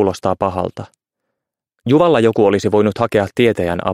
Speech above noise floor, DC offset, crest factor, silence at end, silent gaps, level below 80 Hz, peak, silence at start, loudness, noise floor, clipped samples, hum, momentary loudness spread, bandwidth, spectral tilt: 64 dB; under 0.1%; 14 dB; 0 s; none; -48 dBFS; -2 dBFS; 0 s; -15 LUFS; -79 dBFS; under 0.1%; none; 11 LU; 14 kHz; -6.5 dB/octave